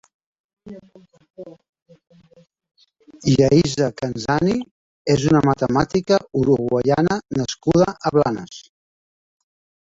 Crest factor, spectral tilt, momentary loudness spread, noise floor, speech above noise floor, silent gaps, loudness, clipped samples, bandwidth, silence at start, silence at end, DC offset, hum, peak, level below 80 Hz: 18 dB; -6.5 dB/octave; 22 LU; -47 dBFS; 28 dB; 1.69-1.73 s, 1.82-1.86 s, 4.71-5.05 s; -19 LUFS; under 0.1%; 7.8 kHz; 0.65 s; 1.4 s; under 0.1%; none; -2 dBFS; -48 dBFS